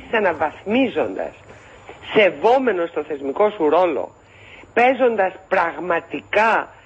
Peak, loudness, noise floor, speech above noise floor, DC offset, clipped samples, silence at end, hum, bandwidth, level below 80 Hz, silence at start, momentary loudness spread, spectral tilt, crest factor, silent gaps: -4 dBFS; -19 LUFS; -44 dBFS; 25 dB; under 0.1%; under 0.1%; 0.2 s; none; 8.4 kHz; -56 dBFS; 0 s; 10 LU; -5.5 dB/octave; 16 dB; none